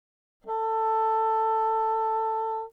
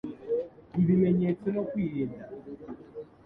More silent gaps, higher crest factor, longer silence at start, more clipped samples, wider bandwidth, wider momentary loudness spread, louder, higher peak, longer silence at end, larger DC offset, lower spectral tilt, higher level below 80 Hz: neither; second, 8 dB vs 16 dB; first, 0.45 s vs 0.05 s; neither; first, 4.7 kHz vs 3.8 kHz; second, 5 LU vs 19 LU; first, -26 LUFS vs -29 LUFS; second, -18 dBFS vs -14 dBFS; second, 0.05 s vs 0.2 s; neither; second, -3.5 dB/octave vs -12 dB/octave; second, -70 dBFS vs -60 dBFS